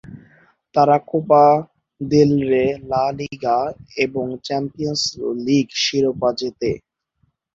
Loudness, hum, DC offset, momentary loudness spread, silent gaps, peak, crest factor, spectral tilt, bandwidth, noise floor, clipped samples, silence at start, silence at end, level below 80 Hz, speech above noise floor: -19 LUFS; none; under 0.1%; 10 LU; none; -2 dBFS; 18 dB; -5 dB/octave; 7.8 kHz; -66 dBFS; under 0.1%; 0.1 s; 0.75 s; -52 dBFS; 48 dB